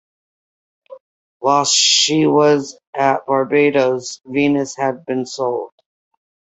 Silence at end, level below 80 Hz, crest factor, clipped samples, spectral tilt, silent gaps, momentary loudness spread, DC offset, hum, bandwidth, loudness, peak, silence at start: 0.9 s; -64 dBFS; 16 dB; under 0.1%; -3 dB/octave; 1.00-1.40 s, 2.87-2.93 s; 12 LU; under 0.1%; none; 8.2 kHz; -16 LUFS; 0 dBFS; 0.9 s